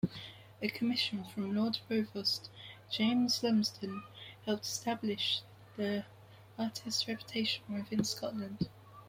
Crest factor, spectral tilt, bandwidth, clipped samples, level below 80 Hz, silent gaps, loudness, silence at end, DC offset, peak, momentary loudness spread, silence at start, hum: 18 dB; -4 dB/octave; 16.5 kHz; under 0.1%; -70 dBFS; none; -35 LUFS; 0 s; under 0.1%; -18 dBFS; 14 LU; 0.05 s; none